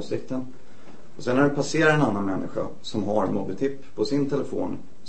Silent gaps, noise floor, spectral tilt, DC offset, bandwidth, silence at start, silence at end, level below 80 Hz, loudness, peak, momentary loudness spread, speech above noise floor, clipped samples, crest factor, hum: none; -49 dBFS; -6 dB/octave; 3%; 8.8 kHz; 0 s; 0.2 s; -56 dBFS; -25 LUFS; -6 dBFS; 12 LU; 24 dB; under 0.1%; 20 dB; none